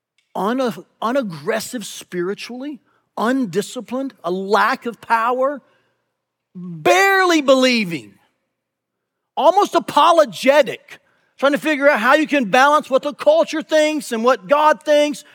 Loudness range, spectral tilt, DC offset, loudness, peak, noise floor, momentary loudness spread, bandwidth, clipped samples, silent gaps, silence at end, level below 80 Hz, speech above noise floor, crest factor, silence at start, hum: 8 LU; -4 dB/octave; under 0.1%; -17 LUFS; -2 dBFS; -78 dBFS; 15 LU; 19 kHz; under 0.1%; none; 0.15 s; -78 dBFS; 61 dB; 16 dB; 0.35 s; none